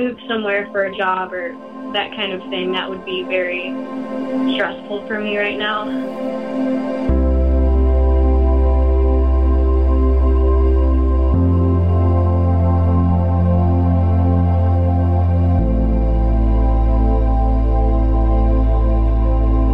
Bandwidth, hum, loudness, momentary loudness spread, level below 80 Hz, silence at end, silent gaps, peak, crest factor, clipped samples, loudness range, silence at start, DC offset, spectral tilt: 4 kHz; none; -17 LUFS; 7 LU; -18 dBFS; 0 s; none; -4 dBFS; 10 dB; under 0.1%; 6 LU; 0 s; 0.5%; -9.5 dB/octave